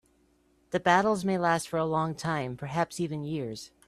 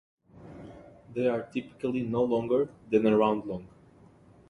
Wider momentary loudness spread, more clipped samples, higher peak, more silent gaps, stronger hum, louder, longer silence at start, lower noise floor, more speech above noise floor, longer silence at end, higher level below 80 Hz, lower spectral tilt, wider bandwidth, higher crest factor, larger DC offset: second, 10 LU vs 23 LU; neither; about the same, -8 dBFS vs -10 dBFS; neither; neither; about the same, -29 LUFS vs -28 LUFS; first, 0.7 s vs 0.35 s; first, -67 dBFS vs -56 dBFS; first, 38 dB vs 29 dB; second, 0.2 s vs 0.85 s; about the same, -62 dBFS vs -62 dBFS; second, -5.5 dB/octave vs -8.5 dB/octave; first, 14 kHz vs 10.5 kHz; about the same, 22 dB vs 20 dB; neither